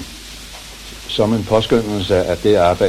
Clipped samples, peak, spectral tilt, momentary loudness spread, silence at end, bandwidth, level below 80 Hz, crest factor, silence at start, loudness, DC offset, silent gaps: under 0.1%; -2 dBFS; -5.5 dB/octave; 18 LU; 0 s; 15.5 kHz; -38 dBFS; 16 dB; 0 s; -16 LUFS; under 0.1%; none